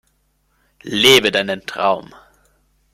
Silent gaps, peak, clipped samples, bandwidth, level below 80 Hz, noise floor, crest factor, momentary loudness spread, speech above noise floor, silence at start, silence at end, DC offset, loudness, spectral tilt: none; 0 dBFS; under 0.1%; 15.5 kHz; -56 dBFS; -63 dBFS; 20 dB; 14 LU; 47 dB; 0.85 s; 0.9 s; under 0.1%; -15 LUFS; -2.5 dB/octave